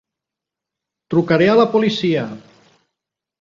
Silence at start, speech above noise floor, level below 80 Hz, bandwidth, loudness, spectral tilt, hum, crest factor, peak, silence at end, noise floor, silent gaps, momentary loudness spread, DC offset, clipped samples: 1.1 s; 70 dB; -58 dBFS; 7.4 kHz; -16 LUFS; -7 dB/octave; none; 18 dB; -2 dBFS; 1 s; -85 dBFS; none; 9 LU; under 0.1%; under 0.1%